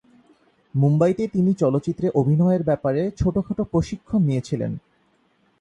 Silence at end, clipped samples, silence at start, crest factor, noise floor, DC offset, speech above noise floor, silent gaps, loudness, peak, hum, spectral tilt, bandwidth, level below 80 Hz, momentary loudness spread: 0.8 s; under 0.1%; 0.75 s; 16 dB; -63 dBFS; under 0.1%; 43 dB; none; -22 LUFS; -6 dBFS; none; -9 dB/octave; 9.2 kHz; -46 dBFS; 8 LU